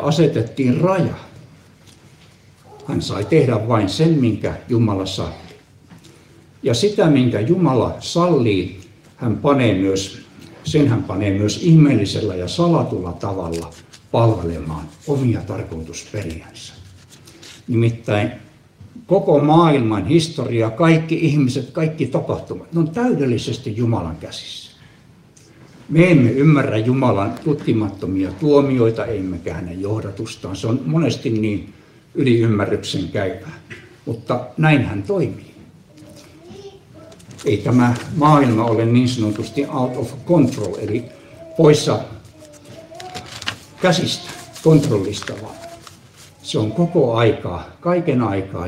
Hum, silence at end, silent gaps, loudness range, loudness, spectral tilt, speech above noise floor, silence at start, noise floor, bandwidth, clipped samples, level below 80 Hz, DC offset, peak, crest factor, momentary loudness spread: none; 0 s; none; 6 LU; -18 LUFS; -7 dB/octave; 31 dB; 0 s; -48 dBFS; 12.5 kHz; under 0.1%; -48 dBFS; under 0.1%; 0 dBFS; 18 dB; 16 LU